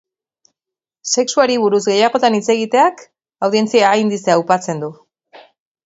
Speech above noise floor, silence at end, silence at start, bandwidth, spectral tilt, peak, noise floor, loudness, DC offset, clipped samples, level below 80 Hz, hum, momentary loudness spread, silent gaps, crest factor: 72 dB; 0.95 s; 1.05 s; 8 kHz; -3.5 dB/octave; 0 dBFS; -87 dBFS; -15 LUFS; under 0.1%; under 0.1%; -66 dBFS; none; 9 LU; none; 16 dB